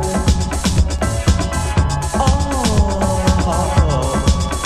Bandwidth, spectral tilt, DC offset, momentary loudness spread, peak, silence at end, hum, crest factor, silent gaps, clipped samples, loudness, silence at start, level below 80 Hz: 14 kHz; -5.5 dB/octave; under 0.1%; 2 LU; 0 dBFS; 0 s; none; 16 dB; none; under 0.1%; -17 LUFS; 0 s; -18 dBFS